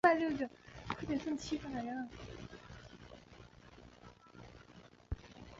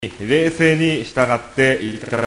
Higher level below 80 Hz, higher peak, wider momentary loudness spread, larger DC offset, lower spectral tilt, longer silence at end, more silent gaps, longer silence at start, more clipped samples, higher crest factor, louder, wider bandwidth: second, -58 dBFS vs -48 dBFS; second, -16 dBFS vs -2 dBFS; first, 20 LU vs 5 LU; neither; about the same, -4.5 dB/octave vs -5.5 dB/octave; about the same, 0 s vs 0 s; neither; about the same, 0.05 s vs 0 s; neither; first, 24 dB vs 16 dB; second, -40 LUFS vs -17 LUFS; second, 7.6 kHz vs 11 kHz